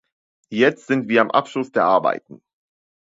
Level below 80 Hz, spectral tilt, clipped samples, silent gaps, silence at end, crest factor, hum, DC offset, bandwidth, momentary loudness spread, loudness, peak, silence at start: -70 dBFS; -6 dB/octave; under 0.1%; none; 0.7 s; 20 dB; none; under 0.1%; 7.8 kHz; 7 LU; -19 LUFS; 0 dBFS; 0.5 s